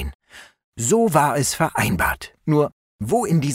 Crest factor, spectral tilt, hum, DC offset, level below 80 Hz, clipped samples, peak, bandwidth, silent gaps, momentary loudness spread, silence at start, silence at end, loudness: 18 dB; -5 dB/octave; none; under 0.1%; -40 dBFS; under 0.1%; -2 dBFS; 16 kHz; 0.15-0.19 s, 0.64-0.73 s, 2.72-2.99 s; 10 LU; 0 s; 0 s; -20 LUFS